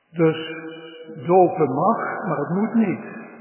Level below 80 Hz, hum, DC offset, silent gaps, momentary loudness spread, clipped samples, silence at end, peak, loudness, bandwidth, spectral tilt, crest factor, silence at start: -74 dBFS; none; under 0.1%; none; 20 LU; under 0.1%; 0 s; -4 dBFS; -21 LUFS; 3.2 kHz; -11.5 dB/octave; 18 dB; 0.15 s